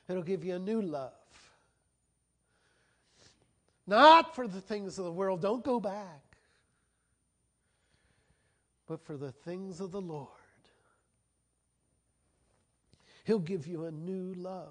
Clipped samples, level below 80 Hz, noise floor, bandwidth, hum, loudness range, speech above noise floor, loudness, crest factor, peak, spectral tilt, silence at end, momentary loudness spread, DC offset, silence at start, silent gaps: under 0.1%; -76 dBFS; -78 dBFS; 10 kHz; none; 21 LU; 48 dB; -30 LUFS; 26 dB; -8 dBFS; -5.5 dB/octave; 0 s; 22 LU; under 0.1%; 0.1 s; none